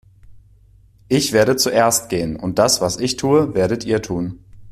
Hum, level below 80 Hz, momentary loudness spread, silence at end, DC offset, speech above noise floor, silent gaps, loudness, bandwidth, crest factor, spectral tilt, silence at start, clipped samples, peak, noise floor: none; -46 dBFS; 8 LU; 0 s; under 0.1%; 32 dB; none; -17 LUFS; 15.5 kHz; 16 dB; -4 dB/octave; 0.3 s; under 0.1%; -2 dBFS; -50 dBFS